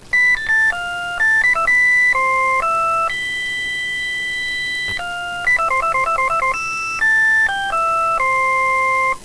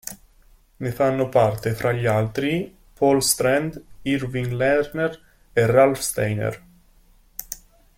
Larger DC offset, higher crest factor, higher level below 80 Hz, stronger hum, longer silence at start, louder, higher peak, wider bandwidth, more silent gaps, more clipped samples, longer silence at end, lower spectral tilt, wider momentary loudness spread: neither; second, 10 dB vs 20 dB; about the same, -44 dBFS vs -48 dBFS; neither; about the same, 0 s vs 0.05 s; first, -16 LUFS vs -21 LUFS; second, -8 dBFS vs -2 dBFS; second, 11 kHz vs 16.5 kHz; neither; neither; second, 0 s vs 0.4 s; second, -1 dB/octave vs -5 dB/octave; second, 8 LU vs 17 LU